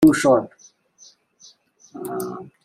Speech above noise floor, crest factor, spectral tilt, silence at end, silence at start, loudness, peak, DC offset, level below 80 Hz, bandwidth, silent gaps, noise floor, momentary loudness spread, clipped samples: 31 dB; 18 dB; -5.5 dB/octave; 0.2 s; 0 s; -20 LUFS; -4 dBFS; under 0.1%; -58 dBFS; 15.5 kHz; none; -53 dBFS; 22 LU; under 0.1%